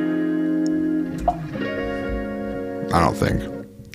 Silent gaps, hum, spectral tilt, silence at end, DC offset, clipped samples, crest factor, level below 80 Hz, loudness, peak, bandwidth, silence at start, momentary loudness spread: none; none; -7 dB/octave; 0 s; under 0.1%; under 0.1%; 18 dB; -38 dBFS; -23 LUFS; -4 dBFS; 15.5 kHz; 0 s; 9 LU